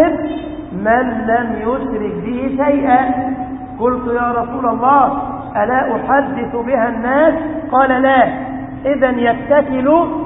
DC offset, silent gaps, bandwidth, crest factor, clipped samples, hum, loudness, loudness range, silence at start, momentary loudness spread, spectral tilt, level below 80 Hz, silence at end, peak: under 0.1%; none; 3.9 kHz; 14 dB; under 0.1%; none; -15 LUFS; 3 LU; 0 s; 10 LU; -11.5 dB/octave; -40 dBFS; 0 s; 0 dBFS